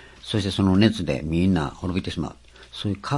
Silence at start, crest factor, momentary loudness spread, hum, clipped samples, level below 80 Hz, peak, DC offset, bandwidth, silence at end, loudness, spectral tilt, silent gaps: 0 s; 20 dB; 13 LU; none; under 0.1%; -46 dBFS; -4 dBFS; under 0.1%; 11.5 kHz; 0 s; -23 LUFS; -6.5 dB/octave; none